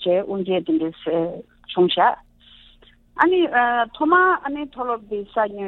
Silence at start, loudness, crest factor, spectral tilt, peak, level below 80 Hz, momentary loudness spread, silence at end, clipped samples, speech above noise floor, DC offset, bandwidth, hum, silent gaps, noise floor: 0 s; -20 LUFS; 20 dB; -7.5 dB/octave; 0 dBFS; -56 dBFS; 12 LU; 0 s; under 0.1%; 32 dB; under 0.1%; 4.2 kHz; none; none; -52 dBFS